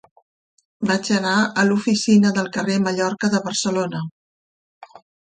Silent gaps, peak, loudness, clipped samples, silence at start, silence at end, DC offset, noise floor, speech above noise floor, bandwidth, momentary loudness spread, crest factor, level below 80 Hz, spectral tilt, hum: 4.11-4.81 s; -4 dBFS; -19 LUFS; under 0.1%; 0.8 s; 0.45 s; under 0.1%; under -90 dBFS; over 71 dB; 9.4 kHz; 9 LU; 16 dB; -64 dBFS; -4.5 dB/octave; none